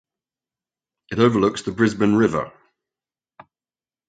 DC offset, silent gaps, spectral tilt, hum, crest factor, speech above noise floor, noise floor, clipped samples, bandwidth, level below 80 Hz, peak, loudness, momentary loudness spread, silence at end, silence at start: under 0.1%; none; -6.5 dB/octave; none; 20 dB; over 71 dB; under -90 dBFS; under 0.1%; 9.2 kHz; -54 dBFS; -2 dBFS; -20 LUFS; 11 LU; 1.6 s; 1.1 s